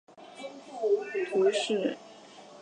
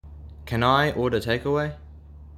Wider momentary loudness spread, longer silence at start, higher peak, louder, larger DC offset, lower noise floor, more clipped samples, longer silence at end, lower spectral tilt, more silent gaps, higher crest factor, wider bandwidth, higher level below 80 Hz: about the same, 23 LU vs 23 LU; about the same, 0.15 s vs 0.05 s; second, -14 dBFS vs -6 dBFS; second, -29 LUFS vs -24 LUFS; neither; first, -50 dBFS vs -44 dBFS; neither; about the same, 0 s vs 0 s; second, -4 dB/octave vs -6.5 dB/octave; neither; about the same, 16 dB vs 18 dB; second, 9.8 kHz vs 15.5 kHz; second, -86 dBFS vs -44 dBFS